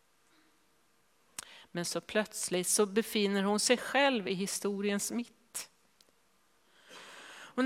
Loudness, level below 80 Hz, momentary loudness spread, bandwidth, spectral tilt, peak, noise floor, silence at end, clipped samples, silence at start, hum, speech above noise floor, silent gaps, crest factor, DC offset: -32 LUFS; -78 dBFS; 20 LU; 16 kHz; -3 dB/octave; -12 dBFS; -71 dBFS; 0 s; under 0.1%; 1.45 s; none; 40 dB; none; 22 dB; under 0.1%